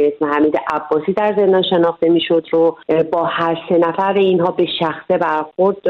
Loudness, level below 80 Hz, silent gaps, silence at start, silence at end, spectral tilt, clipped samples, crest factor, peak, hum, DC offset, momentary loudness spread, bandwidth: -16 LUFS; -58 dBFS; none; 0 s; 0 s; -8 dB/octave; under 0.1%; 12 dB; -2 dBFS; none; under 0.1%; 4 LU; 6 kHz